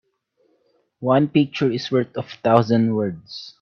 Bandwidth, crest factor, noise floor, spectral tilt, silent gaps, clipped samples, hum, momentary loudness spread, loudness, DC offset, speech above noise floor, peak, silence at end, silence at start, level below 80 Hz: 7 kHz; 20 dB; -66 dBFS; -7.5 dB/octave; none; under 0.1%; none; 12 LU; -20 LUFS; under 0.1%; 46 dB; 0 dBFS; 0.1 s; 1 s; -62 dBFS